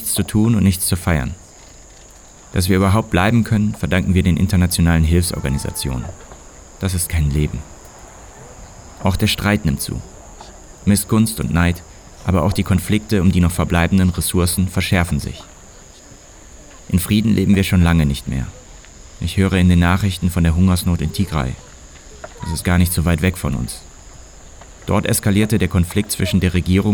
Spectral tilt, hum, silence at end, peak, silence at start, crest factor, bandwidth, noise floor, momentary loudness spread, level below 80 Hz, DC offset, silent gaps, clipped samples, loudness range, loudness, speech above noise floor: -5.5 dB/octave; none; 0 s; -2 dBFS; 0 s; 16 dB; over 20 kHz; -42 dBFS; 13 LU; -32 dBFS; under 0.1%; none; under 0.1%; 5 LU; -17 LUFS; 26 dB